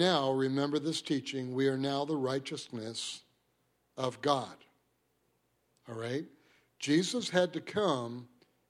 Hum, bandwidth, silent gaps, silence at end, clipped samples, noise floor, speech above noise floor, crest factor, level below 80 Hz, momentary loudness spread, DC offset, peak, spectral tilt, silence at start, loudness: none; 14.5 kHz; none; 0.45 s; under 0.1%; -76 dBFS; 43 dB; 22 dB; -78 dBFS; 13 LU; under 0.1%; -12 dBFS; -4.5 dB/octave; 0 s; -33 LUFS